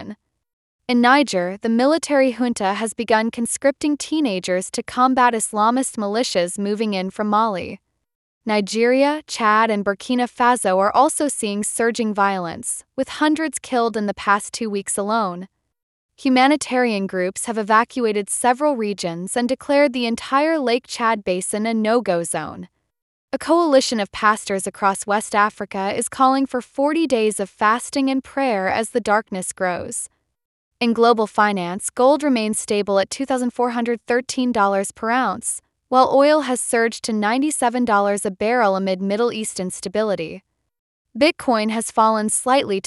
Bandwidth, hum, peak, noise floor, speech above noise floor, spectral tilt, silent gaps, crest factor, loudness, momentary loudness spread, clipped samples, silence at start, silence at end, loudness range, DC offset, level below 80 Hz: 12 kHz; none; -2 dBFS; -39 dBFS; 19 dB; -3.5 dB/octave; 0.53-0.79 s, 8.15-8.41 s, 15.83-16.09 s, 23.02-23.28 s, 30.45-30.71 s, 40.79-41.05 s; 18 dB; -19 LUFS; 9 LU; under 0.1%; 0 s; 0.05 s; 3 LU; under 0.1%; -60 dBFS